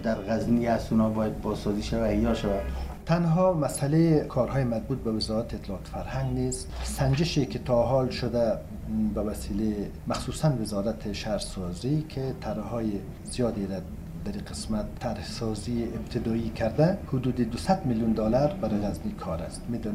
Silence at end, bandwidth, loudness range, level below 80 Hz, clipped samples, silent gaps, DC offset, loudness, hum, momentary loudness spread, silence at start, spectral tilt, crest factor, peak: 0 s; 15.5 kHz; 6 LU; -40 dBFS; under 0.1%; none; under 0.1%; -28 LUFS; none; 10 LU; 0 s; -6.5 dB/octave; 18 dB; -10 dBFS